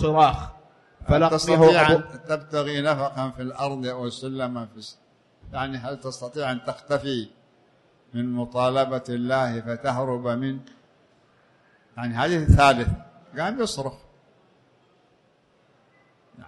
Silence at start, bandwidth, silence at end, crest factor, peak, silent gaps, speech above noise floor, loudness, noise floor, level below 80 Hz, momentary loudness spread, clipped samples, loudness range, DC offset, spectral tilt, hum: 0 s; 11.5 kHz; 0 s; 20 dB; -6 dBFS; none; 39 dB; -23 LUFS; -62 dBFS; -40 dBFS; 18 LU; under 0.1%; 10 LU; under 0.1%; -6 dB/octave; none